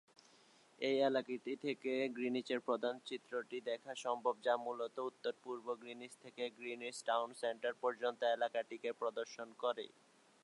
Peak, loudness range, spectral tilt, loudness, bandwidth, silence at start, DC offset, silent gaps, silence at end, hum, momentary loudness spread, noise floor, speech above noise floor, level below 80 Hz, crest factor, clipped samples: -22 dBFS; 3 LU; -3.5 dB/octave; -41 LUFS; 11.5 kHz; 0.8 s; under 0.1%; none; 0.55 s; none; 9 LU; -68 dBFS; 28 dB; under -90 dBFS; 18 dB; under 0.1%